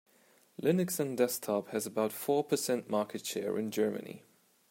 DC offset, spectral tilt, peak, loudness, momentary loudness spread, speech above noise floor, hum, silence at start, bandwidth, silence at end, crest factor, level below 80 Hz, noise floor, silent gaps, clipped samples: under 0.1%; -5 dB/octave; -14 dBFS; -33 LUFS; 6 LU; 33 dB; none; 0.6 s; 16.5 kHz; 0.5 s; 18 dB; -82 dBFS; -66 dBFS; none; under 0.1%